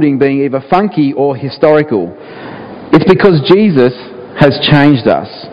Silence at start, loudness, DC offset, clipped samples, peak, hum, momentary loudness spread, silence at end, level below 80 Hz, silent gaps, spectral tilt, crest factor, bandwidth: 0 s; -10 LUFS; under 0.1%; 1%; 0 dBFS; none; 20 LU; 0 s; -42 dBFS; none; -8.5 dB/octave; 10 dB; 6 kHz